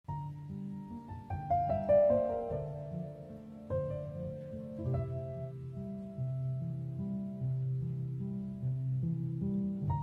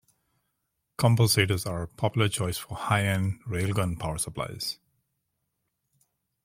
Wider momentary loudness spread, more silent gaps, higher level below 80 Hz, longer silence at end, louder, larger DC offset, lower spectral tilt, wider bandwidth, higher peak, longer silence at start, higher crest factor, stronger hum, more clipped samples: about the same, 12 LU vs 11 LU; neither; about the same, -56 dBFS vs -54 dBFS; second, 0 s vs 1.7 s; second, -36 LUFS vs -27 LUFS; neither; first, -11.5 dB/octave vs -4.5 dB/octave; second, 3.9 kHz vs 16 kHz; second, -18 dBFS vs -6 dBFS; second, 0.1 s vs 1 s; second, 18 dB vs 24 dB; neither; neither